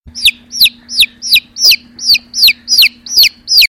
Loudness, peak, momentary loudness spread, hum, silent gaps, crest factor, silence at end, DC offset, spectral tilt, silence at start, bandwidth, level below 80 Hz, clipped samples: -8 LUFS; 0 dBFS; 4 LU; none; none; 10 dB; 0 s; 0.1%; 3 dB/octave; 0.15 s; 17 kHz; -46 dBFS; under 0.1%